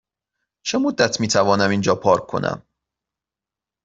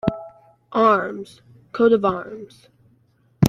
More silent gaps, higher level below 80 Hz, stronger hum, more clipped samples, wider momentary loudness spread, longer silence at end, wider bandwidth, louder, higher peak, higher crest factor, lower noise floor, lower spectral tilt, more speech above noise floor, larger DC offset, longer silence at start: neither; about the same, -56 dBFS vs -52 dBFS; neither; neither; second, 9 LU vs 20 LU; first, 1.25 s vs 0 s; second, 8.2 kHz vs 11 kHz; about the same, -19 LUFS vs -20 LUFS; about the same, -2 dBFS vs -2 dBFS; about the same, 18 dB vs 20 dB; first, -88 dBFS vs -60 dBFS; second, -4.5 dB/octave vs -7 dB/octave; first, 70 dB vs 40 dB; neither; first, 0.65 s vs 0.05 s